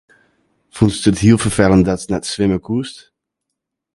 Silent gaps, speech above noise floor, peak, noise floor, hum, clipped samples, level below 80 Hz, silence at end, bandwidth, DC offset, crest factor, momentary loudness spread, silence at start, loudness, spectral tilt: none; 64 dB; 0 dBFS; -78 dBFS; none; under 0.1%; -38 dBFS; 1 s; 11.5 kHz; under 0.1%; 16 dB; 10 LU; 0.75 s; -15 LUFS; -6 dB/octave